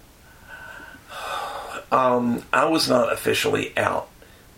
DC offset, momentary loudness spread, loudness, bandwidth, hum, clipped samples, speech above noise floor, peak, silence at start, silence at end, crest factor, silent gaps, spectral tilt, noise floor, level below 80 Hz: under 0.1%; 21 LU; -22 LUFS; 16.5 kHz; none; under 0.1%; 27 dB; -2 dBFS; 0.5 s; 0.5 s; 22 dB; none; -4 dB/octave; -48 dBFS; -54 dBFS